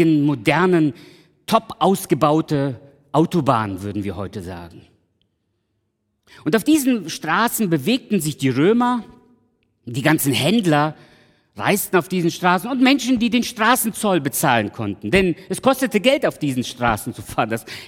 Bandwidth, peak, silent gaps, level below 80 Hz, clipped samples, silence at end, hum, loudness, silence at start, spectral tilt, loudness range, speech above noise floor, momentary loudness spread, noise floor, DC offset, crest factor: 18 kHz; -2 dBFS; none; -50 dBFS; under 0.1%; 0 s; none; -19 LUFS; 0 s; -5 dB/octave; 6 LU; 53 dB; 10 LU; -71 dBFS; under 0.1%; 18 dB